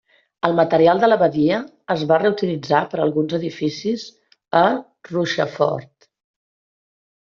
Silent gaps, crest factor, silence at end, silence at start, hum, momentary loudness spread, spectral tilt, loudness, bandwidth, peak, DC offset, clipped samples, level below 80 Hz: none; 20 dB; 1.35 s; 0.45 s; none; 10 LU; -4.5 dB/octave; -19 LUFS; 7.2 kHz; 0 dBFS; under 0.1%; under 0.1%; -62 dBFS